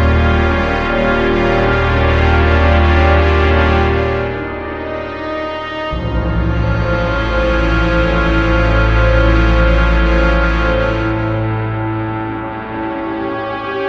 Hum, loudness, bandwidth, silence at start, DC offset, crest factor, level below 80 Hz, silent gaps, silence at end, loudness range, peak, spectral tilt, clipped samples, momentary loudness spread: none; -15 LUFS; 6.6 kHz; 0 s; 0.8%; 14 dB; -18 dBFS; none; 0 s; 6 LU; 0 dBFS; -7.5 dB/octave; under 0.1%; 10 LU